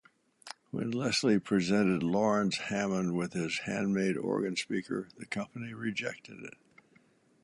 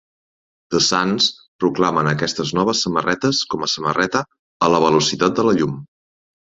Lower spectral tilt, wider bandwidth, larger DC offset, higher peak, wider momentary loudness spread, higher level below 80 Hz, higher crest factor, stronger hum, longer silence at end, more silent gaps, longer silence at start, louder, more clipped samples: about the same, -5 dB/octave vs -4 dB/octave; first, 11.5 kHz vs 8 kHz; neither; second, -16 dBFS vs -2 dBFS; first, 13 LU vs 6 LU; second, -68 dBFS vs -54 dBFS; about the same, 18 dB vs 18 dB; neither; first, 0.95 s vs 0.65 s; second, none vs 1.48-1.59 s, 4.39-4.60 s; second, 0.45 s vs 0.7 s; second, -32 LUFS vs -18 LUFS; neither